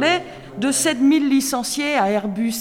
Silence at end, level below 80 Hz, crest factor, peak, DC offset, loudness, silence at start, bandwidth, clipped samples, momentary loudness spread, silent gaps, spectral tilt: 0 s; -54 dBFS; 14 dB; -4 dBFS; under 0.1%; -19 LUFS; 0 s; 16.5 kHz; under 0.1%; 7 LU; none; -3 dB/octave